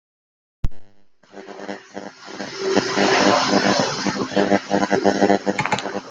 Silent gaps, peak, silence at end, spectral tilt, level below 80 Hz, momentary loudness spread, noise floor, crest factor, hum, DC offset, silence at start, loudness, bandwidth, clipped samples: none; -2 dBFS; 0 s; -4 dB/octave; -40 dBFS; 18 LU; -48 dBFS; 20 dB; none; under 0.1%; 0.65 s; -19 LUFS; 9.4 kHz; under 0.1%